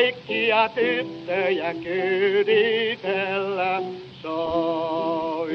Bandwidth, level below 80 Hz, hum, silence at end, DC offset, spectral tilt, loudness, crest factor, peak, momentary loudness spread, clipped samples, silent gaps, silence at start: 6.2 kHz; -62 dBFS; none; 0 s; under 0.1%; -6.5 dB/octave; -23 LUFS; 16 dB; -8 dBFS; 8 LU; under 0.1%; none; 0 s